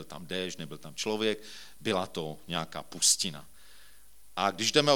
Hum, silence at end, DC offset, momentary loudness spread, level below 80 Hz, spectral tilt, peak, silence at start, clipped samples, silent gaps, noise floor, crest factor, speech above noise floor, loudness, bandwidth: none; 0 s; 0.4%; 17 LU; -66 dBFS; -2 dB/octave; -6 dBFS; 0 s; under 0.1%; none; -59 dBFS; 26 dB; 29 dB; -30 LUFS; 19 kHz